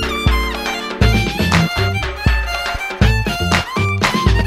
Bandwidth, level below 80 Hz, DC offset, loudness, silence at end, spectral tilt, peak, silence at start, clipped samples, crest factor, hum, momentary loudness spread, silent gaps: 15.5 kHz; -22 dBFS; under 0.1%; -17 LUFS; 0 s; -5 dB/octave; 0 dBFS; 0 s; under 0.1%; 16 dB; none; 5 LU; none